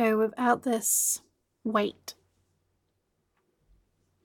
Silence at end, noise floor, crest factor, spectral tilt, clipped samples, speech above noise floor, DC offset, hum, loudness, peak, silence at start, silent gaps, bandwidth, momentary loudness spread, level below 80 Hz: 2.1 s; -76 dBFS; 20 dB; -3 dB/octave; under 0.1%; 49 dB; under 0.1%; none; -27 LUFS; -10 dBFS; 0 s; none; 17.5 kHz; 15 LU; -74 dBFS